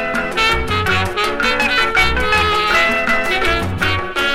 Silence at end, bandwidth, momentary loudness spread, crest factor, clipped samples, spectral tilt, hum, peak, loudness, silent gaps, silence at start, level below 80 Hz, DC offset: 0 s; 16.5 kHz; 4 LU; 14 dB; under 0.1%; -4 dB/octave; none; -2 dBFS; -15 LUFS; none; 0 s; -30 dBFS; under 0.1%